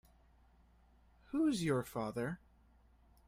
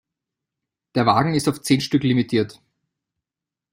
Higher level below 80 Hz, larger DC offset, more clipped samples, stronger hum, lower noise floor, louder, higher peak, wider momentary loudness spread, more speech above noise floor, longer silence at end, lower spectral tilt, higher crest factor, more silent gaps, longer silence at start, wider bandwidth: second, -66 dBFS vs -56 dBFS; neither; neither; neither; second, -67 dBFS vs -88 dBFS; second, -38 LUFS vs -20 LUFS; second, -22 dBFS vs -4 dBFS; first, 9 LU vs 6 LU; second, 31 dB vs 69 dB; second, 0.9 s vs 1.2 s; about the same, -6 dB/octave vs -5.5 dB/octave; about the same, 18 dB vs 20 dB; neither; first, 1.3 s vs 0.95 s; about the same, 16 kHz vs 16 kHz